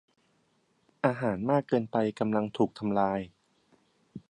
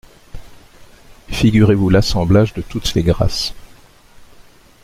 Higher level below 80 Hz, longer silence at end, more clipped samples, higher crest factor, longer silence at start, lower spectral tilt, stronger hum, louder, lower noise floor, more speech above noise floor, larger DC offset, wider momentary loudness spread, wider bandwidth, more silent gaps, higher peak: second, -66 dBFS vs -30 dBFS; second, 0.1 s vs 1.2 s; neither; first, 22 dB vs 16 dB; first, 1.05 s vs 0.35 s; first, -8 dB/octave vs -6 dB/octave; neither; second, -29 LUFS vs -15 LUFS; first, -71 dBFS vs -45 dBFS; first, 42 dB vs 31 dB; neither; about the same, 12 LU vs 10 LU; second, 9.6 kHz vs 15.5 kHz; neither; second, -8 dBFS vs -2 dBFS